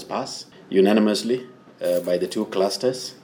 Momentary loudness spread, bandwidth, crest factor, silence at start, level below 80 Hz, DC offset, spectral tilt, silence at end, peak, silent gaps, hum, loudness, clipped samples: 11 LU; over 20 kHz; 16 dB; 0 s; -72 dBFS; under 0.1%; -5 dB/octave; 0.1 s; -6 dBFS; none; none; -22 LUFS; under 0.1%